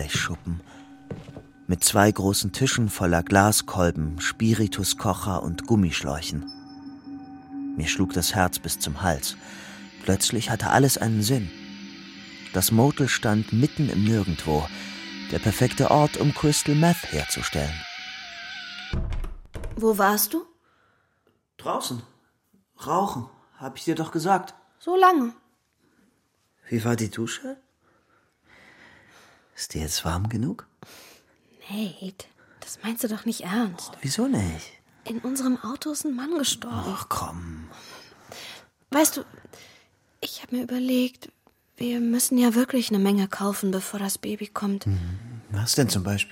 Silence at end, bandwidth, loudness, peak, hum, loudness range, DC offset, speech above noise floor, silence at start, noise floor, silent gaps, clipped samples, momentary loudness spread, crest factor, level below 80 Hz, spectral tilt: 0 s; 16.5 kHz; -25 LUFS; -2 dBFS; none; 9 LU; under 0.1%; 45 dB; 0 s; -69 dBFS; none; under 0.1%; 20 LU; 24 dB; -44 dBFS; -4.5 dB/octave